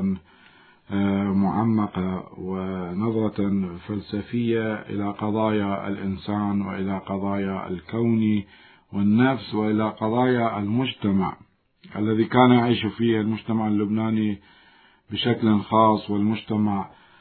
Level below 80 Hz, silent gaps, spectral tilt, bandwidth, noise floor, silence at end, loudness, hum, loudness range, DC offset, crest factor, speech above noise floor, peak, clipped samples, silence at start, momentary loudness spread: -60 dBFS; none; -11.5 dB/octave; 4.5 kHz; -56 dBFS; 0.35 s; -24 LUFS; none; 4 LU; under 0.1%; 20 dB; 33 dB; -2 dBFS; under 0.1%; 0 s; 10 LU